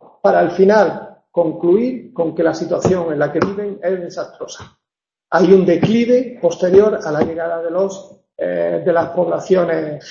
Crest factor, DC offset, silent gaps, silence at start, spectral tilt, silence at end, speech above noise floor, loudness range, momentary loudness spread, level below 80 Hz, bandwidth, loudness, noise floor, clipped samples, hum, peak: 16 dB; under 0.1%; none; 0.25 s; -7 dB/octave; 0 s; 70 dB; 5 LU; 11 LU; -52 dBFS; 7.4 kHz; -16 LUFS; -85 dBFS; under 0.1%; none; 0 dBFS